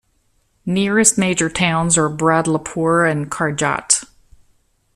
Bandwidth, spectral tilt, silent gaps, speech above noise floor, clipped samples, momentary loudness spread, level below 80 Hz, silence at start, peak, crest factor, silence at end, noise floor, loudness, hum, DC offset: 14 kHz; -3.5 dB/octave; none; 45 dB; under 0.1%; 7 LU; -48 dBFS; 0.65 s; 0 dBFS; 18 dB; 0.9 s; -62 dBFS; -16 LUFS; none; under 0.1%